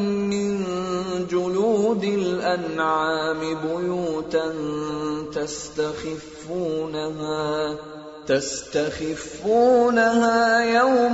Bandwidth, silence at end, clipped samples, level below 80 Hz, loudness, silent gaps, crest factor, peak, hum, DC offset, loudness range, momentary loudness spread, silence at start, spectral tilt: 8 kHz; 0 s; under 0.1%; -54 dBFS; -23 LUFS; none; 16 dB; -6 dBFS; none; under 0.1%; 7 LU; 11 LU; 0 s; -4.5 dB/octave